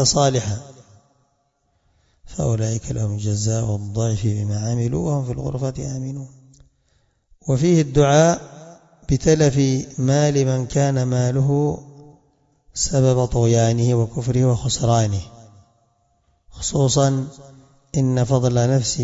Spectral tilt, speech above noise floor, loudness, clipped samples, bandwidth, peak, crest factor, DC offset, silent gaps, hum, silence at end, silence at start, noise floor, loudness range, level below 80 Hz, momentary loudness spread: -5.5 dB/octave; 48 dB; -20 LUFS; under 0.1%; 7.8 kHz; -2 dBFS; 18 dB; under 0.1%; none; none; 0 s; 0 s; -67 dBFS; 6 LU; -42 dBFS; 12 LU